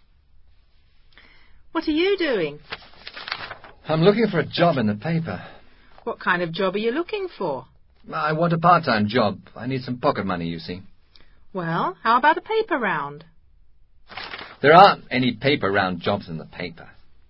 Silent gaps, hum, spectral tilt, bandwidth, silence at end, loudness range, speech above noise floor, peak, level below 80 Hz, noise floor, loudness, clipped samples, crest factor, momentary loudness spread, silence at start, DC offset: none; none; -8.5 dB/octave; 5.8 kHz; 0.15 s; 7 LU; 33 dB; 0 dBFS; -54 dBFS; -53 dBFS; -21 LUFS; under 0.1%; 22 dB; 18 LU; 1.75 s; under 0.1%